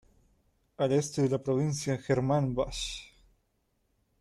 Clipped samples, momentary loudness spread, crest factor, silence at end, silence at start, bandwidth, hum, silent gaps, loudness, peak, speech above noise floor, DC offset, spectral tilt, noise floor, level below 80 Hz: under 0.1%; 7 LU; 16 dB; 1.15 s; 0.8 s; 13 kHz; none; none; -30 LUFS; -14 dBFS; 46 dB; under 0.1%; -6 dB/octave; -75 dBFS; -54 dBFS